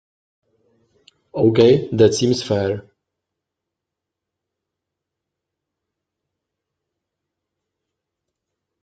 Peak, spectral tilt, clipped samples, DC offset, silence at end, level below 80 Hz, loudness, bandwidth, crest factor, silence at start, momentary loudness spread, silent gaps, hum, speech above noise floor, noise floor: -2 dBFS; -6 dB/octave; under 0.1%; under 0.1%; 6.05 s; -60 dBFS; -16 LUFS; 9 kHz; 22 dB; 1.35 s; 12 LU; none; none; 68 dB; -83 dBFS